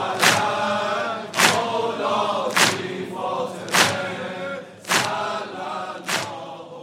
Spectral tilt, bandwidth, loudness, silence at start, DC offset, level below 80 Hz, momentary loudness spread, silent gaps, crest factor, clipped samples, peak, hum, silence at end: -2 dB/octave; 16 kHz; -22 LUFS; 0 s; under 0.1%; -72 dBFS; 12 LU; none; 22 dB; under 0.1%; 0 dBFS; none; 0 s